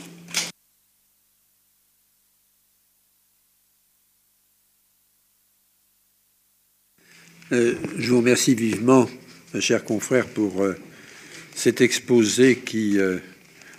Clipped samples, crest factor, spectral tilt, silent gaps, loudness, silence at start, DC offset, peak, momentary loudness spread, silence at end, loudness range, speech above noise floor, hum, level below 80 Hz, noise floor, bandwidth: under 0.1%; 22 dB; -4 dB/octave; none; -21 LUFS; 0 s; under 0.1%; -4 dBFS; 17 LU; 0.55 s; 10 LU; 45 dB; 50 Hz at -60 dBFS; -70 dBFS; -65 dBFS; 15.5 kHz